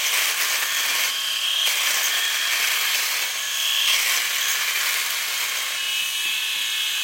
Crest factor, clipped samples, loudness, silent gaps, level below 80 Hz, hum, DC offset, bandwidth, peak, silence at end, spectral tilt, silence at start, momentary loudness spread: 16 dB; under 0.1%; -20 LUFS; none; -72 dBFS; none; under 0.1%; 16.5 kHz; -6 dBFS; 0 s; 4.5 dB/octave; 0 s; 4 LU